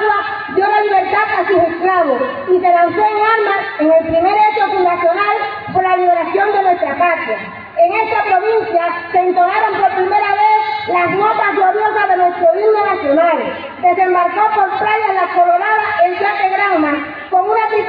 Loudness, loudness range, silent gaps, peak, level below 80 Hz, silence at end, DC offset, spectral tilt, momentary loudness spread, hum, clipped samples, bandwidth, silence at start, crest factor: -13 LUFS; 2 LU; none; -2 dBFS; -54 dBFS; 0 s; under 0.1%; -7.5 dB/octave; 4 LU; none; under 0.1%; 5 kHz; 0 s; 12 dB